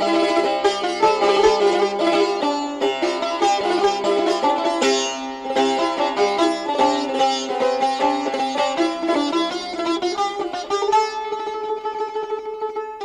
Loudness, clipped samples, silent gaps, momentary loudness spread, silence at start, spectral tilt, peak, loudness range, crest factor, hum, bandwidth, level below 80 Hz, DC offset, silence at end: -20 LUFS; under 0.1%; none; 8 LU; 0 s; -2.5 dB/octave; -4 dBFS; 4 LU; 16 dB; none; 11.5 kHz; -56 dBFS; under 0.1%; 0 s